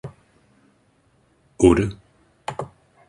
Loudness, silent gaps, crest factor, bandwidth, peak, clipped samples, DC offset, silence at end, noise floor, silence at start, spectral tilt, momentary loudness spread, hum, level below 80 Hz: -20 LUFS; none; 22 dB; 11 kHz; -2 dBFS; under 0.1%; under 0.1%; 0.45 s; -61 dBFS; 0.05 s; -6.5 dB/octave; 22 LU; none; -42 dBFS